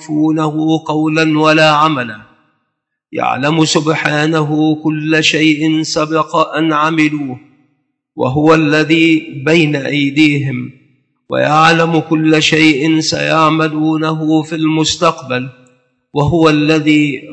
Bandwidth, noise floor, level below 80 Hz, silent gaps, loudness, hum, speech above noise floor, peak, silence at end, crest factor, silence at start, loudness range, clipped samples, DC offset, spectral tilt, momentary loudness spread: 8.6 kHz; -71 dBFS; -48 dBFS; none; -12 LUFS; none; 59 dB; 0 dBFS; 0 s; 12 dB; 0 s; 3 LU; 0.1%; under 0.1%; -5 dB/octave; 10 LU